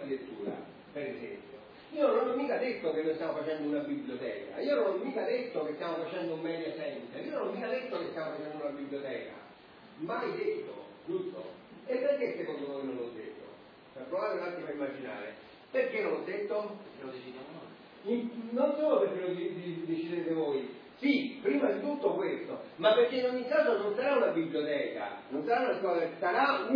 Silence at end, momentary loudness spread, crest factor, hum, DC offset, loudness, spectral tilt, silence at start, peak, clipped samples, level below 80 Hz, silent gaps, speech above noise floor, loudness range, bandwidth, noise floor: 0 s; 17 LU; 20 dB; none; under 0.1%; -33 LUFS; -3.5 dB/octave; 0 s; -14 dBFS; under 0.1%; -80 dBFS; none; 22 dB; 8 LU; 5.2 kHz; -54 dBFS